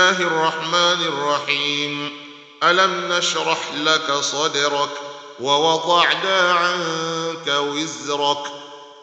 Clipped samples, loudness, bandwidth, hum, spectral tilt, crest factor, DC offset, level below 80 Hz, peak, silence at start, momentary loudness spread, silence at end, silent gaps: under 0.1%; -19 LUFS; 9 kHz; none; -2 dB/octave; 18 dB; under 0.1%; -76 dBFS; -2 dBFS; 0 s; 12 LU; 0 s; none